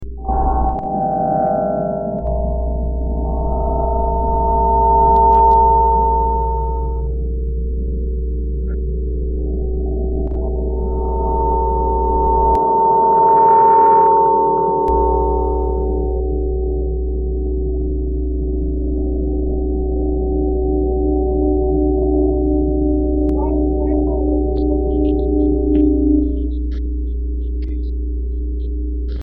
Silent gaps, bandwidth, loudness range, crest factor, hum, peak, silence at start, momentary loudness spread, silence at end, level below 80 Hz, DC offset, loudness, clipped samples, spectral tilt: none; 2.2 kHz; 8 LU; 14 dB; none; -2 dBFS; 0 s; 11 LU; 0 s; -20 dBFS; under 0.1%; -17 LUFS; under 0.1%; -11 dB/octave